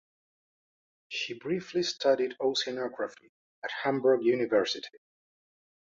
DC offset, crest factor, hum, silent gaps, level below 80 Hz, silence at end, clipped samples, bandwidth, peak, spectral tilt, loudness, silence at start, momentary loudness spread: under 0.1%; 18 dB; none; 3.29-3.62 s; -76 dBFS; 1.05 s; under 0.1%; 7.8 kHz; -12 dBFS; -4 dB/octave; -30 LUFS; 1.1 s; 12 LU